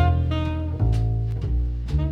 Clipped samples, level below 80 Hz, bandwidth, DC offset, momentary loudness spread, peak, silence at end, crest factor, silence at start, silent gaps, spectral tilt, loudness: under 0.1%; -26 dBFS; 6.6 kHz; under 0.1%; 4 LU; -8 dBFS; 0 s; 14 dB; 0 s; none; -8.5 dB/octave; -25 LUFS